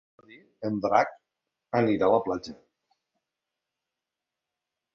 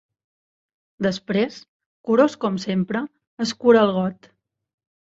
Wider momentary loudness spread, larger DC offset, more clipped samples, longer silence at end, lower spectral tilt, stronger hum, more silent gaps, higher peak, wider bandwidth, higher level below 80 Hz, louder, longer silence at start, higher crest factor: about the same, 12 LU vs 12 LU; neither; neither; first, 2.4 s vs 0.95 s; about the same, -7 dB/octave vs -6 dB/octave; neither; second, none vs 1.68-1.80 s, 1.86-2.04 s, 3.27-3.37 s; second, -6 dBFS vs -2 dBFS; about the same, 7.4 kHz vs 7.8 kHz; about the same, -66 dBFS vs -64 dBFS; second, -26 LUFS vs -21 LUFS; second, 0.6 s vs 1 s; about the same, 24 dB vs 20 dB